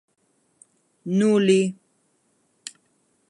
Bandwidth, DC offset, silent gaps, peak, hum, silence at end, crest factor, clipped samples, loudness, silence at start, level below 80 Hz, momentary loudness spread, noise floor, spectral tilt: 11.5 kHz; under 0.1%; none; -6 dBFS; none; 1.55 s; 18 dB; under 0.1%; -20 LUFS; 1.05 s; -74 dBFS; 22 LU; -68 dBFS; -6 dB/octave